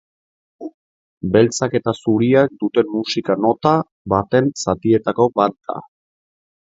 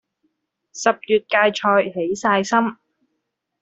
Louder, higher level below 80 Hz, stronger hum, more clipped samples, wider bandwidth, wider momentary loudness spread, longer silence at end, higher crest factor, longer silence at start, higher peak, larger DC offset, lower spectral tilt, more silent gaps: about the same, -17 LUFS vs -19 LUFS; first, -50 dBFS vs -66 dBFS; neither; neither; about the same, 8 kHz vs 8.2 kHz; first, 15 LU vs 7 LU; about the same, 0.95 s vs 0.9 s; about the same, 18 dB vs 20 dB; second, 0.6 s vs 0.75 s; about the same, 0 dBFS vs -2 dBFS; neither; first, -6 dB/octave vs -4 dB/octave; first, 0.74-1.21 s, 3.92-4.05 s vs none